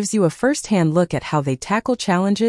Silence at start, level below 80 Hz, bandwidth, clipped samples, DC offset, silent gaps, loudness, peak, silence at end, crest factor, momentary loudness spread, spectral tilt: 0 s; -52 dBFS; 12 kHz; under 0.1%; under 0.1%; none; -19 LUFS; -6 dBFS; 0 s; 14 dB; 4 LU; -5.5 dB/octave